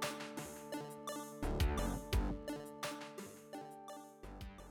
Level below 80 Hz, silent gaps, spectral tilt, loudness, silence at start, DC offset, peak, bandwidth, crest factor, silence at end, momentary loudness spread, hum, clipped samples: -46 dBFS; none; -5 dB/octave; -44 LUFS; 0 s; under 0.1%; -26 dBFS; 19 kHz; 16 dB; 0 s; 15 LU; none; under 0.1%